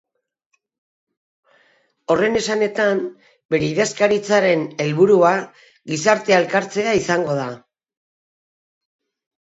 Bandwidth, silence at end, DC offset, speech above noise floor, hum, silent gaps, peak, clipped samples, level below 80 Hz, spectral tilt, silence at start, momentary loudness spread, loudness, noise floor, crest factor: 8.2 kHz; 1.85 s; under 0.1%; 53 dB; none; 3.45-3.49 s; 0 dBFS; under 0.1%; -60 dBFS; -4.5 dB/octave; 2.1 s; 11 LU; -18 LUFS; -70 dBFS; 20 dB